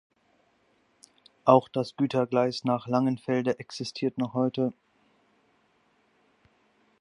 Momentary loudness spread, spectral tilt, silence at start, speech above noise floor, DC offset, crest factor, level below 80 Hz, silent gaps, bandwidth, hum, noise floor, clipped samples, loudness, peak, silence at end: 10 LU; -7 dB/octave; 1.45 s; 42 dB; under 0.1%; 26 dB; -72 dBFS; none; 11 kHz; none; -68 dBFS; under 0.1%; -27 LUFS; -4 dBFS; 2.3 s